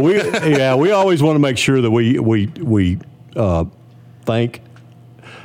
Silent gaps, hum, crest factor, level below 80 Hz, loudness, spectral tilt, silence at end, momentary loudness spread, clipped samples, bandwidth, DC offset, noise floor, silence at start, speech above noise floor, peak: none; none; 12 dB; -42 dBFS; -16 LUFS; -6.5 dB/octave; 0 s; 10 LU; under 0.1%; 16 kHz; under 0.1%; -42 dBFS; 0 s; 27 dB; -4 dBFS